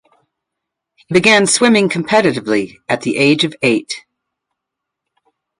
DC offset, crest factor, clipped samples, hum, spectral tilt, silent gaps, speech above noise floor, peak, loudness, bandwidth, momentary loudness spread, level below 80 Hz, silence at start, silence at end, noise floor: under 0.1%; 16 dB; under 0.1%; none; -3.5 dB/octave; none; 66 dB; 0 dBFS; -13 LUFS; 11.5 kHz; 10 LU; -58 dBFS; 1.1 s; 1.6 s; -80 dBFS